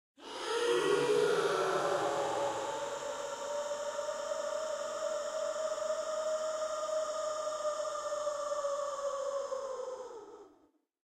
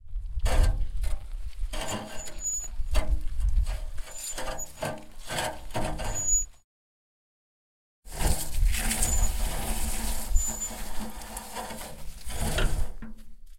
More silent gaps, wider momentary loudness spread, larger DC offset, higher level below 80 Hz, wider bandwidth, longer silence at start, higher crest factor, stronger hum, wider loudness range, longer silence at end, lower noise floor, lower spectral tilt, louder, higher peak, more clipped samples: second, none vs 6.64-8.03 s; second, 9 LU vs 13 LU; second, under 0.1% vs 0.2%; second, -76 dBFS vs -30 dBFS; second, 14.5 kHz vs 16.5 kHz; first, 0.2 s vs 0.05 s; about the same, 16 dB vs 18 dB; neither; about the same, 5 LU vs 4 LU; first, 0.55 s vs 0 s; second, -69 dBFS vs under -90 dBFS; about the same, -2.5 dB/octave vs -3 dB/octave; second, -35 LUFS vs -31 LUFS; second, -20 dBFS vs -8 dBFS; neither